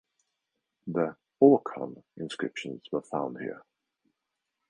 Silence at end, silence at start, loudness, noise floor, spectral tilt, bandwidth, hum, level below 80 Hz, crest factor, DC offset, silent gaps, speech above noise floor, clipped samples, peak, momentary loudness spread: 1.1 s; 0.85 s; -29 LUFS; -85 dBFS; -7 dB/octave; 9.8 kHz; none; -74 dBFS; 24 dB; under 0.1%; none; 57 dB; under 0.1%; -6 dBFS; 19 LU